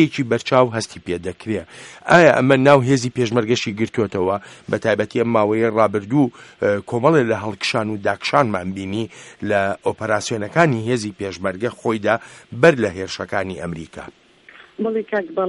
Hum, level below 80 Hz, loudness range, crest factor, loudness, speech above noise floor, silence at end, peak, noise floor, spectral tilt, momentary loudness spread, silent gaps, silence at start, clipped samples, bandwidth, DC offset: none; -56 dBFS; 5 LU; 18 dB; -19 LUFS; 28 dB; 0 s; 0 dBFS; -46 dBFS; -5.5 dB/octave; 13 LU; none; 0 s; under 0.1%; 11.5 kHz; under 0.1%